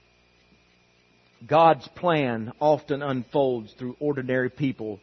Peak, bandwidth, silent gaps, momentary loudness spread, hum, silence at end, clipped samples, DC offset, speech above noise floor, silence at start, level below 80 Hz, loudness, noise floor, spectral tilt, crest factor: -6 dBFS; 6.4 kHz; none; 10 LU; 60 Hz at -60 dBFS; 0.05 s; under 0.1%; under 0.1%; 37 dB; 1.4 s; -66 dBFS; -24 LUFS; -61 dBFS; -8 dB/octave; 20 dB